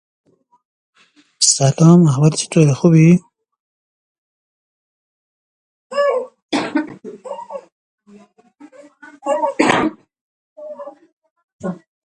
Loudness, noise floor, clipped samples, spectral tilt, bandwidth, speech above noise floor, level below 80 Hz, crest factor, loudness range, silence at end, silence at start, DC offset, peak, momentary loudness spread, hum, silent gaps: -14 LUFS; -47 dBFS; under 0.1%; -5 dB/octave; 11 kHz; 36 dB; -58 dBFS; 18 dB; 12 LU; 0.3 s; 1.4 s; under 0.1%; 0 dBFS; 23 LU; none; 3.60-5.90 s, 6.42-6.49 s, 7.72-7.98 s, 10.21-10.56 s, 11.12-11.22 s, 11.31-11.36 s, 11.44-11.59 s